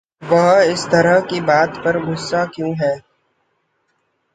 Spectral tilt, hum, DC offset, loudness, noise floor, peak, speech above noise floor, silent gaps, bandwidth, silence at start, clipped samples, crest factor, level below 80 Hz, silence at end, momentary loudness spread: -5.5 dB/octave; none; under 0.1%; -16 LUFS; -67 dBFS; -2 dBFS; 51 dB; none; 9.4 kHz; 0.2 s; under 0.1%; 16 dB; -56 dBFS; 1.35 s; 8 LU